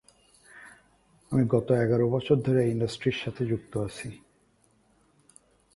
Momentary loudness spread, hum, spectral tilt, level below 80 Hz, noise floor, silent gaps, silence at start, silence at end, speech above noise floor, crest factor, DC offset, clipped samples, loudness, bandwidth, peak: 17 LU; none; -7.5 dB/octave; -58 dBFS; -66 dBFS; none; 0.55 s; 1.6 s; 40 dB; 20 dB; under 0.1%; under 0.1%; -27 LUFS; 11.5 kHz; -10 dBFS